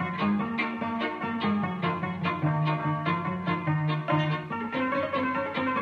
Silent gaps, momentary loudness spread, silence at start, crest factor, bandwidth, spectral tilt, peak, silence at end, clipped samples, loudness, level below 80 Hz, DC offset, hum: none; 3 LU; 0 s; 16 dB; 6 kHz; -8.5 dB/octave; -12 dBFS; 0 s; under 0.1%; -28 LUFS; -66 dBFS; under 0.1%; none